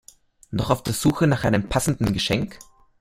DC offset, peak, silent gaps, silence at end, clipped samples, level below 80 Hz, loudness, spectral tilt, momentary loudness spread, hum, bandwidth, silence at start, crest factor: under 0.1%; -2 dBFS; none; 0.45 s; under 0.1%; -42 dBFS; -22 LUFS; -5 dB/octave; 8 LU; none; 16.5 kHz; 0.5 s; 20 dB